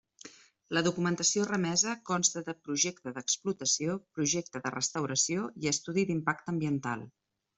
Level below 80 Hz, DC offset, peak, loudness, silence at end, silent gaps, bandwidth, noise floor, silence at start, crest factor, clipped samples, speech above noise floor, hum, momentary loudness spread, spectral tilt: -70 dBFS; under 0.1%; -12 dBFS; -31 LUFS; 0.5 s; none; 8.2 kHz; -54 dBFS; 0.25 s; 22 dB; under 0.1%; 22 dB; none; 8 LU; -3 dB/octave